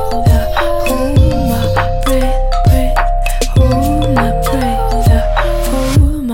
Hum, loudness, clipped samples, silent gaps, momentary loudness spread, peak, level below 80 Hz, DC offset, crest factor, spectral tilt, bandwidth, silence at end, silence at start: none; -13 LUFS; under 0.1%; none; 4 LU; 0 dBFS; -14 dBFS; under 0.1%; 10 dB; -6.5 dB/octave; 17 kHz; 0 s; 0 s